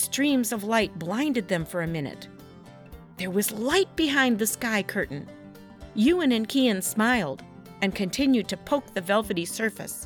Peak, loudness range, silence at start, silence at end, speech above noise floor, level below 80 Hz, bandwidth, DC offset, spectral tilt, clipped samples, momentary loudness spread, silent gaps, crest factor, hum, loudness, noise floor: -10 dBFS; 4 LU; 0 s; 0 s; 22 dB; -54 dBFS; 19 kHz; under 0.1%; -4 dB/octave; under 0.1%; 12 LU; none; 18 dB; none; -25 LUFS; -47 dBFS